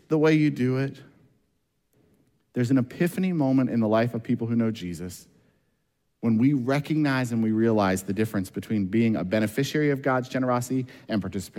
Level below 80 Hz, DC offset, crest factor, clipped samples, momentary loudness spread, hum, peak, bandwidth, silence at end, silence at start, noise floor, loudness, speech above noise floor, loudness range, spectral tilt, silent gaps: -64 dBFS; under 0.1%; 16 dB; under 0.1%; 8 LU; none; -10 dBFS; 16.5 kHz; 0 s; 0.1 s; -74 dBFS; -25 LUFS; 50 dB; 2 LU; -7 dB/octave; none